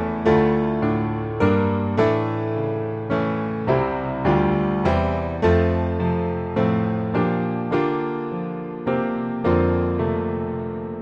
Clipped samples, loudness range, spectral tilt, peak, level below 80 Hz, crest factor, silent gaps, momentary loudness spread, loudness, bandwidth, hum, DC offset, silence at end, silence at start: under 0.1%; 2 LU; -9.5 dB/octave; -6 dBFS; -38 dBFS; 16 dB; none; 7 LU; -22 LUFS; 7.2 kHz; none; under 0.1%; 0 s; 0 s